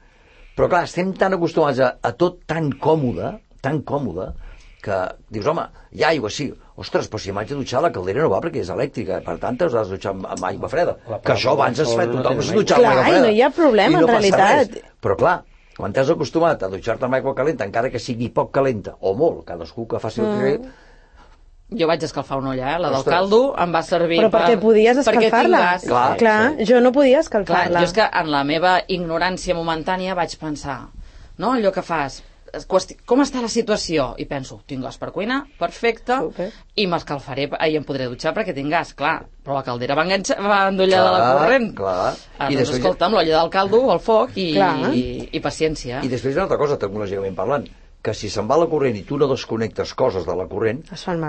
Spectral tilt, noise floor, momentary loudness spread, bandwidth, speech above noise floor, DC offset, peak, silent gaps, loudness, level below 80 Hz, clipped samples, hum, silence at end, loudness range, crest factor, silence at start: -5.5 dB/octave; -48 dBFS; 12 LU; 8.8 kHz; 29 dB; under 0.1%; -2 dBFS; none; -19 LUFS; -44 dBFS; under 0.1%; none; 0 s; 8 LU; 16 dB; 0.55 s